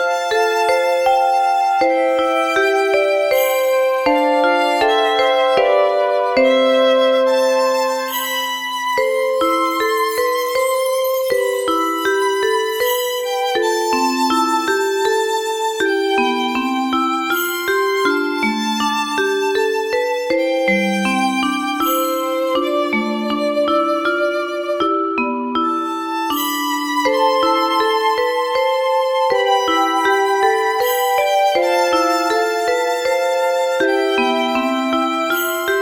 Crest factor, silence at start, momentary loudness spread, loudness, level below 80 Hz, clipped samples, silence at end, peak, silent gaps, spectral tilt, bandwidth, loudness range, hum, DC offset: 14 dB; 0 s; 4 LU; -17 LUFS; -56 dBFS; under 0.1%; 0 s; -2 dBFS; none; -3 dB/octave; over 20 kHz; 3 LU; none; under 0.1%